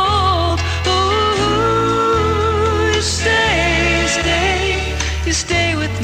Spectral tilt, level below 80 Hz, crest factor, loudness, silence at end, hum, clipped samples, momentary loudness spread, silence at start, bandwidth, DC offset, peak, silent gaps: -4 dB/octave; -26 dBFS; 12 dB; -15 LUFS; 0 s; none; under 0.1%; 4 LU; 0 s; 16 kHz; under 0.1%; -4 dBFS; none